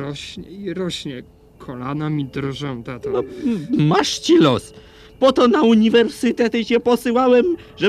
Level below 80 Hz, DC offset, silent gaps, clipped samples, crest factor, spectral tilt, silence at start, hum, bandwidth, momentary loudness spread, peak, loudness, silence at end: -50 dBFS; under 0.1%; none; under 0.1%; 16 dB; -5.5 dB/octave; 0 s; none; 14 kHz; 15 LU; -2 dBFS; -18 LUFS; 0 s